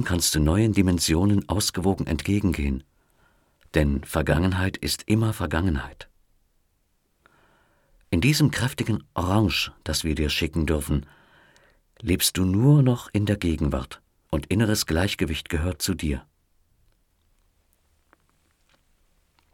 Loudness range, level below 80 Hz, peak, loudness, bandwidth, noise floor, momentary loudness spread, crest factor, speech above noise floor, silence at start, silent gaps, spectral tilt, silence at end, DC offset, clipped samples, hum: 6 LU; -36 dBFS; -6 dBFS; -24 LUFS; 17.5 kHz; -69 dBFS; 8 LU; 20 dB; 46 dB; 0 s; none; -5 dB/octave; 3.35 s; under 0.1%; under 0.1%; none